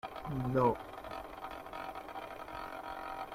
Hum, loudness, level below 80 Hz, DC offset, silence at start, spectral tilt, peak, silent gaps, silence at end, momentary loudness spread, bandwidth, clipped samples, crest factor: none; -39 LUFS; -58 dBFS; under 0.1%; 0.05 s; -7.5 dB/octave; -18 dBFS; none; 0 s; 14 LU; 16 kHz; under 0.1%; 22 dB